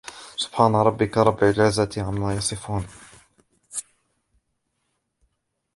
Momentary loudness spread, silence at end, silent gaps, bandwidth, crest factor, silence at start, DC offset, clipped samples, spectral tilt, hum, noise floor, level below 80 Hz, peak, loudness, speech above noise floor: 15 LU; 1.95 s; none; 11.5 kHz; 22 dB; 0.05 s; under 0.1%; under 0.1%; -5 dB/octave; none; -76 dBFS; -48 dBFS; -2 dBFS; -22 LUFS; 54 dB